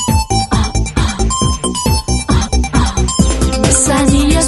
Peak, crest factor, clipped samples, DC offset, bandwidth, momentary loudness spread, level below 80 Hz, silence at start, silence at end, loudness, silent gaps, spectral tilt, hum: 0 dBFS; 12 dB; under 0.1%; under 0.1%; 12 kHz; 5 LU; -18 dBFS; 0 s; 0 s; -13 LUFS; none; -4.5 dB/octave; none